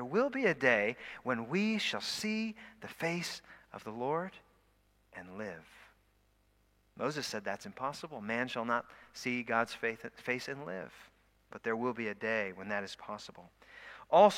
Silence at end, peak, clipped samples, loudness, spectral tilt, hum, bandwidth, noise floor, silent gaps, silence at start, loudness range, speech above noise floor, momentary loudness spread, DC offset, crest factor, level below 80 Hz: 0 s; -10 dBFS; under 0.1%; -35 LUFS; -4.5 dB/octave; none; 16 kHz; -71 dBFS; none; 0 s; 10 LU; 36 dB; 19 LU; under 0.1%; 24 dB; -72 dBFS